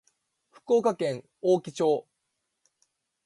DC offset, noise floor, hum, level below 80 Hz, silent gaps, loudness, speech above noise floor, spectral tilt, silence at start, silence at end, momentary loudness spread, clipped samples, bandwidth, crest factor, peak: under 0.1%; -80 dBFS; none; -78 dBFS; none; -27 LUFS; 55 dB; -6 dB/octave; 0.7 s; 1.25 s; 7 LU; under 0.1%; 11.5 kHz; 18 dB; -12 dBFS